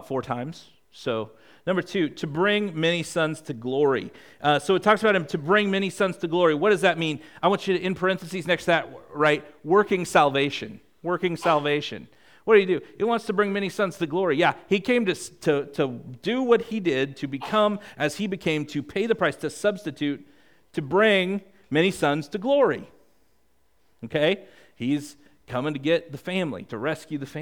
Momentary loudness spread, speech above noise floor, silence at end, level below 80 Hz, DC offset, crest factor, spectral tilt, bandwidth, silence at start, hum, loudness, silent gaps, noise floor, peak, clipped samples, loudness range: 12 LU; 44 dB; 0 s; -64 dBFS; 0.1%; 20 dB; -5.5 dB/octave; 17.5 kHz; 0 s; none; -24 LUFS; none; -68 dBFS; -4 dBFS; under 0.1%; 5 LU